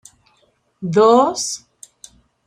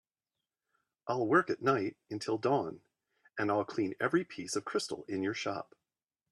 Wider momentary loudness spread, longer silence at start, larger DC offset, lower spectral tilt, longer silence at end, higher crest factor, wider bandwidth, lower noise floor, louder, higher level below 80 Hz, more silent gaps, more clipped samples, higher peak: first, 18 LU vs 13 LU; second, 0.8 s vs 1.05 s; neither; about the same, -4.5 dB/octave vs -5 dB/octave; first, 0.9 s vs 0.7 s; about the same, 18 dB vs 22 dB; about the same, 13.5 kHz vs 12.5 kHz; second, -61 dBFS vs under -90 dBFS; first, -15 LUFS vs -33 LUFS; first, -64 dBFS vs -78 dBFS; neither; neither; first, 0 dBFS vs -14 dBFS